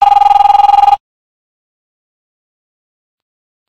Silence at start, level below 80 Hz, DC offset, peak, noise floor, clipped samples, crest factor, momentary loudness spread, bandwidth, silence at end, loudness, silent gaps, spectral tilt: 0 s; -42 dBFS; under 0.1%; 0 dBFS; under -90 dBFS; 0.1%; 12 dB; 5 LU; 8.6 kHz; 2.7 s; -8 LUFS; none; -1.5 dB/octave